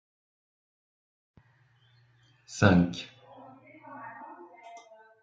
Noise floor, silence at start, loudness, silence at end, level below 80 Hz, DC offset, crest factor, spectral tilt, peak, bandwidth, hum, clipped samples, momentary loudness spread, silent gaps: -65 dBFS; 2.5 s; -25 LUFS; 0.45 s; -64 dBFS; under 0.1%; 26 dB; -6.5 dB/octave; -6 dBFS; 7.8 kHz; none; under 0.1%; 29 LU; none